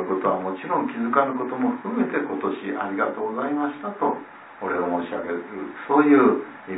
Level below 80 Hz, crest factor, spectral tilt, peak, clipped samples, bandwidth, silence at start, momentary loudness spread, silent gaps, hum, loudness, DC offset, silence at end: -72 dBFS; 20 dB; -10.5 dB/octave; -4 dBFS; under 0.1%; 4 kHz; 0 s; 12 LU; none; none; -24 LUFS; under 0.1%; 0 s